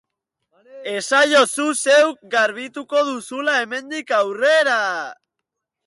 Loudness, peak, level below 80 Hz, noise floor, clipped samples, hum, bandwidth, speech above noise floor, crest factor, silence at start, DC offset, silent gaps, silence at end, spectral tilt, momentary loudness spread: -18 LUFS; -4 dBFS; -76 dBFS; -81 dBFS; under 0.1%; none; 12 kHz; 62 dB; 16 dB; 0.75 s; under 0.1%; none; 0.75 s; -1 dB/octave; 13 LU